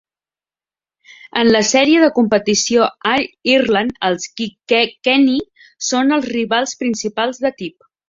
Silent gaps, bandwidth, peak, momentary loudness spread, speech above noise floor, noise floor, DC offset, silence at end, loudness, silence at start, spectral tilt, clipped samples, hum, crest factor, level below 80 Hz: none; 7.8 kHz; -2 dBFS; 10 LU; over 75 dB; under -90 dBFS; under 0.1%; 0.4 s; -16 LUFS; 1.25 s; -3 dB/octave; under 0.1%; none; 16 dB; -56 dBFS